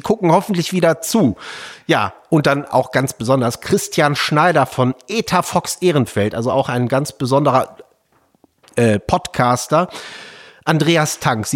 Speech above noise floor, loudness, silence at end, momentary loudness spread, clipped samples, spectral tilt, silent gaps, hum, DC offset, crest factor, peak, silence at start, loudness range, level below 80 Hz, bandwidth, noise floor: 43 dB; -17 LUFS; 0 s; 9 LU; under 0.1%; -5 dB/octave; none; none; under 0.1%; 16 dB; -2 dBFS; 0.05 s; 2 LU; -48 dBFS; 17 kHz; -59 dBFS